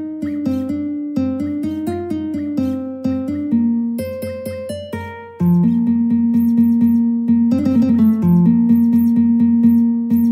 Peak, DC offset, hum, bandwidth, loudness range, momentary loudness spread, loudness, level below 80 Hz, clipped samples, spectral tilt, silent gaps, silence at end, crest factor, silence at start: -4 dBFS; under 0.1%; none; 15.5 kHz; 8 LU; 12 LU; -16 LUFS; -52 dBFS; under 0.1%; -9.5 dB/octave; none; 0 s; 12 dB; 0 s